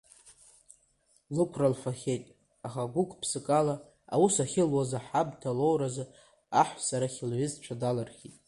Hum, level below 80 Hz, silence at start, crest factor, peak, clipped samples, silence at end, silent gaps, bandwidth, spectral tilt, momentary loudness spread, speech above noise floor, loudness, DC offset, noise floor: none; -66 dBFS; 0.25 s; 20 dB; -10 dBFS; under 0.1%; 0.2 s; none; 11.5 kHz; -5.5 dB/octave; 10 LU; 39 dB; -30 LUFS; under 0.1%; -69 dBFS